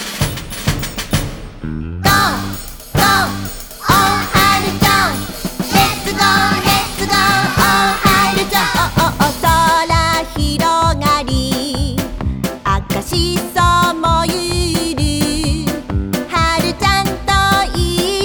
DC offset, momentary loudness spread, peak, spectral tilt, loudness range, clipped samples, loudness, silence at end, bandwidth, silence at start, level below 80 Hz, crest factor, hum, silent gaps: under 0.1%; 9 LU; 0 dBFS; -4 dB/octave; 4 LU; under 0.1%; -14 LUFS; 0 s; over 20 kHz; 0 s; -26 dBFS; 14 dB; none; none